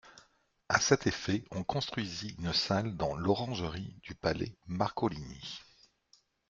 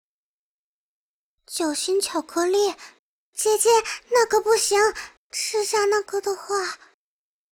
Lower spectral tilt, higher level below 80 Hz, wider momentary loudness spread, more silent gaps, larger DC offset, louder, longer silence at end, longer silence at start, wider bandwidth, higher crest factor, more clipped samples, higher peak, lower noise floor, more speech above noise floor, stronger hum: first, -4.5 dB/octave vs -0.5 dB/octave; first, -58 dBFS vs -64 dBFS; about the same, 14 LU vs 13 LU; second, none vs 2.99-3.33 s, 5.17-5.30 s; neither; second, -33 LUFS vs -22 LUFS; about the same, 0.85 s vs 0.75 s; second, 0.05 s vs 1.5 s; second, 7.8 kHz vs 19 kHz; first, 24 dB vs 18 dB; neither; second, -10 dBFS vs -6 dBFS; second, -69 dBFS vs under -90 dBFS; second, 35 dB vs over 68 dB; neither